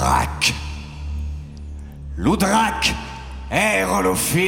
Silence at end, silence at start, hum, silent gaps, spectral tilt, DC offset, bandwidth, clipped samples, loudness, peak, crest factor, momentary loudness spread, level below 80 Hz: 0 s; 0 s; none; none; -4 dB/octave; under 0.1%; 17 kHz; under 0.1%; -20 LUFS; -4 dBFS; 16 dB; 17 LU; -32 dBFS